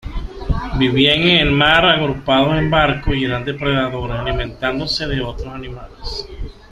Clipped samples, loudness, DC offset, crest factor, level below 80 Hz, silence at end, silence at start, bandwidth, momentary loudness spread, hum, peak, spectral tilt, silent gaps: under 0.1%; -16 LUFS; under 0.1%; 18 dB; -28 dBFS; 0.2 s; 0.05 s; 13 kHz; 18 LU; none; 0 dBFS; -6 dB/octave; none